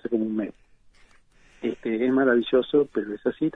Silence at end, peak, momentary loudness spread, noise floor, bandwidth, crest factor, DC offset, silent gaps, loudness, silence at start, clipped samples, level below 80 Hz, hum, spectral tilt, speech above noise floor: 0.05 s; -8 dBFS; 11 LU; -57 dBFS; 6.2 kHz; 18 dB; under 0.1%; none; -25 LUFS; 0.05 s; under 0.1%; -60 dBFS; none; -7.5 dB/octave; 34 dB